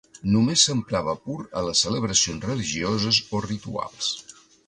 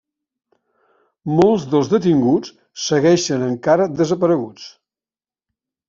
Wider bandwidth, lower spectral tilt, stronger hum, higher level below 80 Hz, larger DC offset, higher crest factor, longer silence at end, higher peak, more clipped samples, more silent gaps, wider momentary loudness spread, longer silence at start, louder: first, 11 kHz vs 7.6 kHz; second, -3.5 dB/octave vs -6 dB/octave; neither; first, -50 dBFS vs -58 dBFS; neither; about the same, 20 dB vs 16 dB; second, 0.35 s vs 1.2 s; about the same, -4 dBFS vs -2 dBFS; neither; neither; second, 11 LU vs 17 LU; second, 0.15 s vs 1.25 s; second, -23 LUFS vs -17 LUFS